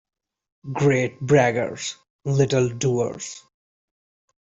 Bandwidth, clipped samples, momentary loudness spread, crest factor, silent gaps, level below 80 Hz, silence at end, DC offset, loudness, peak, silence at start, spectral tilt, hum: 8 kHz; under 0.1%; 16 LU; 18 dB; 2.10-2.19 s; -58 dBFS; 1.15 s; under 0.1%; -22 LUFS; -6 dBFS; 0.65 s; -5.5 dB/octave; none